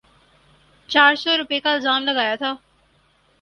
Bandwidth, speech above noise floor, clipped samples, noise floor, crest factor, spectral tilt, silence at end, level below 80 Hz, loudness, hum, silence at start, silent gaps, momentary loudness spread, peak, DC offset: 11 kHz; 41 dB; under 0.1%; -60 dBFS; 22 dB; -2.5 dB/octave; 0.85 s; -64 dBFS; -18 LUFS; none; 0.9 s; none; 11 LU; 0 dBFS; under 0.1%